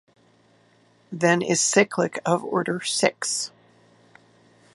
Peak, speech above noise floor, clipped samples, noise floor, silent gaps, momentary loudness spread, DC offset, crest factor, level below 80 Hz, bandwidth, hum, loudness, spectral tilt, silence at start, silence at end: -4 dBFS; 37 dB; under 0.1%; -59 dBFS; none; 8 LU; under 0.1%; 22 dB; -72 dBFS; 11.5 kHz; none; -22 LUFS; -3 dB/octave; 1.1 s; 1.25 s